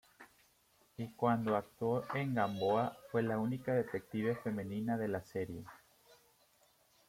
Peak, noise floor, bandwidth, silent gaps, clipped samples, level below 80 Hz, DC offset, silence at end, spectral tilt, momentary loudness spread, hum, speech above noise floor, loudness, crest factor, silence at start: -18 dBFS; -71 dBFS; 16.5 kHz; none; under 0.1%; -72 dBFS; under 0.1%; 1.35 s; -7.5 dB/octave; 11 LU; none; 35 dB; -37 LUFS; 20 dB; 0.2 s